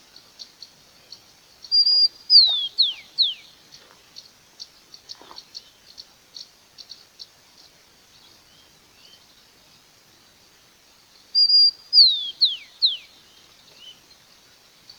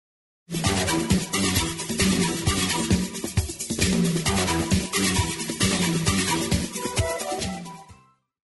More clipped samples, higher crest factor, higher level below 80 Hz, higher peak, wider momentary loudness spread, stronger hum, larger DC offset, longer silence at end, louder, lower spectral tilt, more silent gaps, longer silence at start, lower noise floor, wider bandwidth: neither; first, 22 dB vs 16 dB; second, -74 dBFS vs -38 dBFS; first, -4 dBFS vs -8 dBFS; first, 29 LU vs 6 LU; neither; neither; first, 1.1 s vs 0.55 s; first, -16 LUFS vs -24 LUFS; second, 1 dB/octave vs -4 dB/octave; neither; about the same, 0.4 s vs 0.5 s; about the same, -55 dBFS vs -54 dBFS; first, over 20 kHz vs 12 kHz